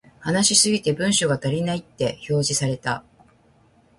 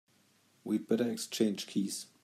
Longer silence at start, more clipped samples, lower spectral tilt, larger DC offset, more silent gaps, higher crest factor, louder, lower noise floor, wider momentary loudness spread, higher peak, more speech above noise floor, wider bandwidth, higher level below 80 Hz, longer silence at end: second, 0.2 s vs 0.65 s; neither; about the same, -3.5 dB/octave vs -4.5 dB/octave; neither; neither; about the same, 20 dB vs 20 dB; first, -21 LUFS vs -34 LUFS; second, -57 dBFS vs -69 dBFS; first, 11 LU vs 5 LU; first, -4 dBFS vs -16 dBFS; about the same, 36 dB vs 35 dB; second, 11.5 kHz vs 15 kHz; first, -56 dBFS vs -84 dBFS; first, 1 s vs 0.2 s